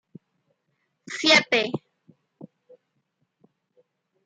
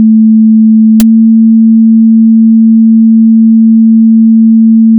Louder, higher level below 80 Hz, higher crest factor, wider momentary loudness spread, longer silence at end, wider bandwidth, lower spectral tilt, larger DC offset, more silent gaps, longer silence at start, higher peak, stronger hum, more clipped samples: second, -20 LUFS vs -4 LUFS; second, -78 dBFS vs -48 dBFS; first, 24 dB vs 4 dB; first, 19 LU vs 0 LU; first, 1.8 s vs 0 s; first, 9.6 kHz vs 0.7 kHz; second, -2.5 dB/octave vs -14 dB/octave; neither; neither; first, 1.1 s vs 0 s; second, -4 dBFS vs 0 dBFS; neither; neither